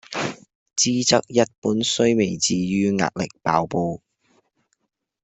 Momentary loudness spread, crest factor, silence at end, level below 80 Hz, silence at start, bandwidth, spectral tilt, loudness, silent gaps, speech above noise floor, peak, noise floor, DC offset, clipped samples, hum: 9 LU; 20 dB; 1.25 s; -58 dBFS; 0.1 s; 8.4 kHz; -4 dB/octave; -21 LUFS; 0.55-0.66 s, 1.58-1.62 s; 52 dB; -4 dBFS; -73 dBFS; under 0.1%; under 0.1%; none